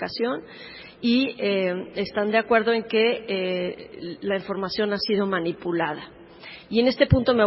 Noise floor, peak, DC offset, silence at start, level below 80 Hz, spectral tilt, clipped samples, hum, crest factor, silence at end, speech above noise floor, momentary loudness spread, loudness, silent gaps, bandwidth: -44 dBFS; -2 dBFS; under 0.1%; 0 s; -46 dBFS; -9.5 dB/octave; under 0.1%; none; 22 dB; 0 s; 20 dB; 16 LU; -24 LUFS; none; 5.8 kHz